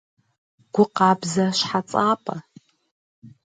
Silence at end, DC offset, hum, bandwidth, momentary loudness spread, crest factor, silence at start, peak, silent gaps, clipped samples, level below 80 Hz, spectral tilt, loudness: 0.15 s; under 0.1%; none; 9.4 kHz; 10 LU; 20 dB; 0.75 s; -4 dBFS; 2.91-3.22 s; under 0.1%; -68 dBFS; -5 dB/octave; -21 LUFS